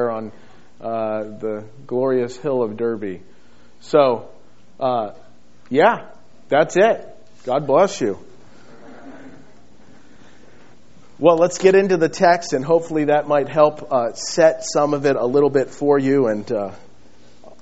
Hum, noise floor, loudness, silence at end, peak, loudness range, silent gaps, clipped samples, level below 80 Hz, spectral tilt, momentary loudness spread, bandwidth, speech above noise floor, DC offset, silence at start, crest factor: none; -51 dBFS; -18 LUFS; 0.85 s; 0 dBFS; 7 LU; none; under 0.1%; -62 dBFS; -4.5 dB/octave; 13 LU; 8 kHz; 33 dB; 1%; 0 s; 18 dB